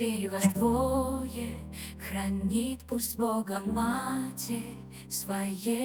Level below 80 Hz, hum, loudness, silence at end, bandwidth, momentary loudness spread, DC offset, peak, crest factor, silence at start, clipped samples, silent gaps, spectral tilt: -50 dBFS; none; -31 LUFS; 0 s; 19.5 kHz; 11 LU; under 0.1%; -12 dBFS; 20 dB; 0 s; under 0.1%; none; -5 dB/octave